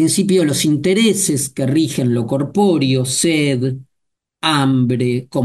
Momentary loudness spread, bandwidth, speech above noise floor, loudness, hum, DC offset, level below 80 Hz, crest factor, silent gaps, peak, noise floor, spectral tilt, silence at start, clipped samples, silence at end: 5 LU; 12.5 kHz; 60 dB; -16 LUFS; none; under 0.1%; -54 dBFS; 14 dB; none; -2 dBFS; -75 dBFS; -5 dB/octave; 0 s; under 0.1%; 0 s